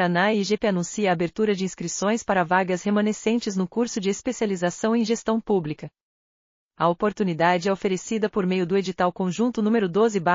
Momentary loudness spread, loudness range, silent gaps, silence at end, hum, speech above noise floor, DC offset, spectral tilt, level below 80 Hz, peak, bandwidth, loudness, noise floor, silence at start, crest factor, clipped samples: 5 LU; 3 LU; 6.02-6.70 s; 0 s; none; over 67 dB; under 0.1%; -5 dB/octave; -60 dBFS; -6 dBFS; 7.4 kHz; -24 LUFS; under -90 dBFS; 0 s; 16 dB; under 0.1%